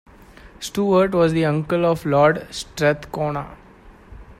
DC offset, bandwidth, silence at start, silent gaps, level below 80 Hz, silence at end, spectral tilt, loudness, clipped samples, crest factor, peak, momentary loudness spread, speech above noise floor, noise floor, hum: under 0.1%; 16 kHz; 0.45 s; none; -46 dBFS; 0.05 s; -6 dB/octave; -20 LUFS; under 0.1%; 18 dB; -2 dBFS; 13 LU; 27 dB; -46 dBFS; none